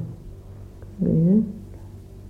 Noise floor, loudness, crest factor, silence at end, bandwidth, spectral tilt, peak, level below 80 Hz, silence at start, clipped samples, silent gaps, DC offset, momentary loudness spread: -40 dBFS; -21 LUFS; 16 dB; 0 s; 2.3 kHz; -11.5 dB/octave; -10 dBFS; -44 dBFS; 0 s; under 0.1%; none; under 0.1%; 24 LU